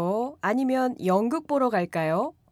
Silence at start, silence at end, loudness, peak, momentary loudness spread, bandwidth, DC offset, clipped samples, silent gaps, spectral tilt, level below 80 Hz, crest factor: 0 s; 0.2 s; -25 LUFS; -12 dBFS; 3 LU; 14.5 kHz; under 0.1%; under 0.1%; none; -7 dB/octave; -70 dBFS; 14 dB